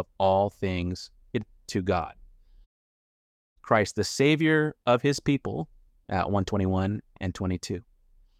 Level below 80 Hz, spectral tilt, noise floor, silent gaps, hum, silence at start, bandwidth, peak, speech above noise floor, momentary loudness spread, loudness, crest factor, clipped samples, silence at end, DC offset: -52 dBFS; -6 dB/octave; -60 dBFS; 2.66-3.56 s; none; 0 s; 14.5 kHz; -8 dBFS; 33 dB; 12 LU; -27 LUFS; 20 dB; under 0.1%; 0.6 s; under 0.1%